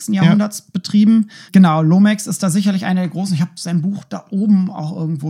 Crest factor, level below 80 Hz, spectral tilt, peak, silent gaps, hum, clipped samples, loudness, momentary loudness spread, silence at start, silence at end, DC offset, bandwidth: 14 dB; -68 dBFS; -6.5 dB/octave; 0 dBFS; none; none; under 0.1%; -15 LUFS; 10 LU; 0 s; 0 s; under 0.1%; 15 kHz